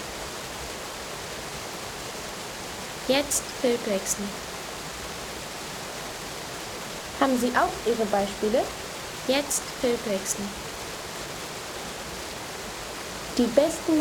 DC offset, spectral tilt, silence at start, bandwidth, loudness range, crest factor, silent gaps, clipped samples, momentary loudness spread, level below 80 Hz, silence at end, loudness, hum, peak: under 0.1%; -3 dB/octave; 0 s; over 20 kHz; 6 LU; 24 dB; none; under 0.1%; 11 LU; -52 dBFS; 0 s; -29 LUFS; none; -6 dBFS